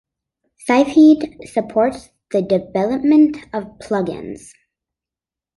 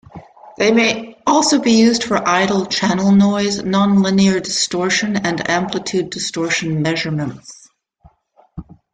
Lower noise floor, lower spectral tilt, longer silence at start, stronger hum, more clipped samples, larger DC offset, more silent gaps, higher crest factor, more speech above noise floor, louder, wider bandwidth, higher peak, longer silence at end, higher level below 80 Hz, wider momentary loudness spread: first, -89 dBFS vs -54 dBFS; first, -6.5 dB/octave vs -4.5 dB/octave; first, 0.65 s vs 0.15 s; neither; neither; neither; neither; about the same, 16 dB vs 16 dB; first, 72 dB vs 39 dB; about the same, -16 LUFS vs -16 LUFS; first, 11.5 kHz vs 9.4 kHz; about the same, -2 dBFS vs -2 dBFS; first, 1.2 s vs 0.3 s; about the same, -54 dBFS vs -52 dBFS; first, 18 LU vs 9 LU